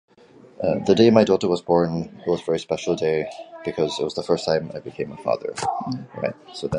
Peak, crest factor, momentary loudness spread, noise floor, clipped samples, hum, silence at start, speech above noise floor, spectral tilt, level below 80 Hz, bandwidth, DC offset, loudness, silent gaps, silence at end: -2 dBFS; 20 dB; 14 LU; -50 dBFS; under 0.1%; none; 0.6 s; 28 dB; -6 dB/octave; -54 dBFS; 11 kHz; under 0.1%; -22 LUFS; none; 0 s